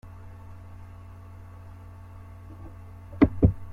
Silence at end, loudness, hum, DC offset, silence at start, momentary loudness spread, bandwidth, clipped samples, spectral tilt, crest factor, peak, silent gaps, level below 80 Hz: 0 s; -23 LUFS; none; under 0.1%; 0.05 s; 23 LU; 4.7 kHz; under 0.1%; -10.5 dB/octave; 24 dB; -4 dBFS; none; -40 dBFS